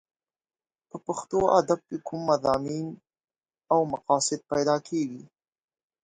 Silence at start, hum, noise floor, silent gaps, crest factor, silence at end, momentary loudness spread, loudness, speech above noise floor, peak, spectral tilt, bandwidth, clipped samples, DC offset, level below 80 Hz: 0.95 s; none; under -90 dBFS; 3.24-3.28 s; 22 dB; 0.8 s; 13 LU; -26 LUFS; over 64 dB; -6 dBFS; -4.5 dB/octave; 9.6 kHz; under 0.1%; under 0.1%; -62 dBFS